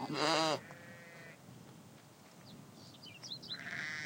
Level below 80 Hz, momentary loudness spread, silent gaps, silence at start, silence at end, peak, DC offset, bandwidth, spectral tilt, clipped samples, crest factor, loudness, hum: -82 dBFS; 24 LU; none; 0 s; 0 s; -18 dBFS; under 0.1%; 16 kHz; -3 dB/octave; under 0.1%; 24 dB; -37 LUFS; none